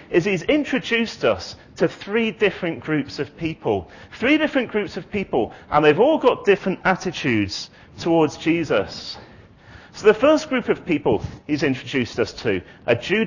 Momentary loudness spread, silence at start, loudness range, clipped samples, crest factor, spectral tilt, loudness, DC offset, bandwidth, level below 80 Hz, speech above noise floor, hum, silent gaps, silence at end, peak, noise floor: 11 LU; 0 s; 3 LU; under 0.1%; 18 dB; -5.5 dB/octave; -21 LUFS; under 0.1%; 7.4 kHz; -48 dBFS; 24 dB; none; none; 0 s; -4 dBFS; -45 dBFS